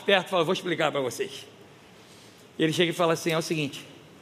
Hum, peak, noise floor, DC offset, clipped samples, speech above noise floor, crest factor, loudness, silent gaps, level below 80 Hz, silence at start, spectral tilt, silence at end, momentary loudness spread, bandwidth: none; -6 dBFS; -51 dBFS; under 0.1%; under 0.1%; 25 dB; 22 dB; -26 LUFS; none; -76 dBFS; 0 s; -4.5 dB/octave; 0.2 s; 19 LU; 15.5 kHz